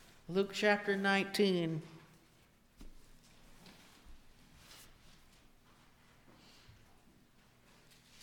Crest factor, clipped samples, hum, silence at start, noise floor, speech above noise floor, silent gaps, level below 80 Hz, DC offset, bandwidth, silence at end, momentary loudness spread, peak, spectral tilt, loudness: 22 dB; under 0.1%; none; 0.3 s; -67 dBFS; 34 dB; none; -64 dBFS; under 0.1%; 19 kHz; 3.4 s; 27 LU; -18 dBFS; -5 dB/octave; -33 LUFS